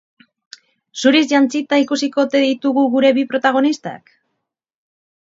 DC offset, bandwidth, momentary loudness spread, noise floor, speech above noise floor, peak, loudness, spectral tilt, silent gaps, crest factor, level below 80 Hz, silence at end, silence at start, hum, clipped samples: under 0.1%; 7.8 kHz; 5 LU; -76 dBFS; 61 dB; 0 dBFS; -16 LUFS; -3.5 dB/octave; none; 16 dB; -72 dBFS; 1.25 s; 0.95 s; none; under 0.1%